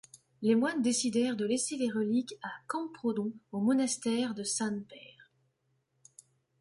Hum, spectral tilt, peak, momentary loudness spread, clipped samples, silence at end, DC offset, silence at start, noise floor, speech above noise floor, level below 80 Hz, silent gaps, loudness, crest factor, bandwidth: none; -4 dB/octave; -16 dBFS; 10 LU; under 0.1%; 1.35 s; under 0.1%; 0.4 s; -77 dBFS; 45 dB; -78 dBFS; none; -32 LUFS; 16 dB; 11.5 kHz